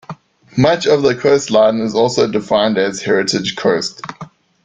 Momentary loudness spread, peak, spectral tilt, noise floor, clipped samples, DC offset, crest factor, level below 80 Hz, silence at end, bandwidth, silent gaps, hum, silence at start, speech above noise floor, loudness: 11 LU; 0 dBFS; -4.5 dB/octave; -35 dBFS; under 0.1%; under 0.1%; 14 dB; -52 dBFS; 0.4 s; 9.4 kHz; none; none; 0.1 s; 21 dB; -15 LUFS